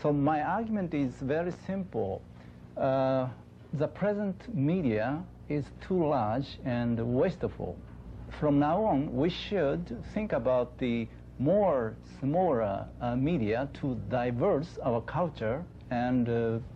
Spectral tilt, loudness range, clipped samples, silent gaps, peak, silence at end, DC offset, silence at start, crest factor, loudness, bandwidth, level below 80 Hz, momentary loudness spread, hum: -9 dB/octave; 2 LU; under 0.1%; none; -16 dBFS; 0 s; under 0.1%; 0 s; 14 dB; -31 LUFS; 8 kHz; -52 dBFS; 10 LU; none